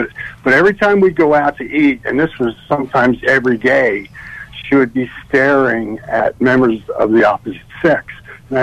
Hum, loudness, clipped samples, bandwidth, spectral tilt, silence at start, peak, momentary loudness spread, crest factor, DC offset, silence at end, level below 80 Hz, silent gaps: none; -14 LUFS; under 0.1%; 10.5 kHz; -7 dB/octave; 0 s; -2 dBFS; 12 LU; 12 dB; under 0.1%; 0 s; -44 dBFS; none